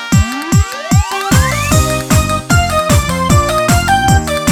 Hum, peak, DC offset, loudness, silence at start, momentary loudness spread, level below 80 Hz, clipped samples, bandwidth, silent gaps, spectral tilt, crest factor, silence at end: none; 0 dBFS; under 0.1%; -12 LUFS; 0 s; 3 LU; -20 dBFS; under 0.1%; 19.5 kHz; none; -4.5 dB/octave; 12 dB; 0 s